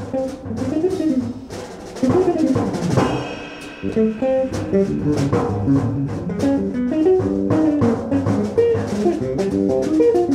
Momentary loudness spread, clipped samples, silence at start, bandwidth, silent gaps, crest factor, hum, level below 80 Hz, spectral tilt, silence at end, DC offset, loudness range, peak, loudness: 9 LU; under 0.1%; 0 s; 12.5 kHz; none; 14 dB; none; -42 dBFS; -7.5 dB/octave; 0 s; under 0.1%; 2 LU; -4 dBFS; -19 LUFS